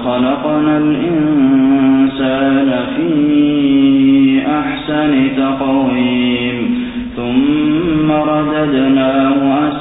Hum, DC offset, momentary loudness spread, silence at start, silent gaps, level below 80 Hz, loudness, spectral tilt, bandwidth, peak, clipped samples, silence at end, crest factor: none; under 0.1%; 6 LU; 0 s; none; -42 dBFS; -13 LUFS; -12 dB/octave; 4 kHz; -2 dBFS; under 0.1%; 0 s; 10 dB